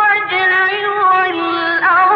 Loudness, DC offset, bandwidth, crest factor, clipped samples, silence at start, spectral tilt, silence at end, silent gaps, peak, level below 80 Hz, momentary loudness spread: -13 LUFS; under 0.1%; 5.8 kHz; 10 dB; under 0.1%; 0 s; -5 dB/octave; 0 s; none; -4 dBFS; -64 dBFS; 4 LU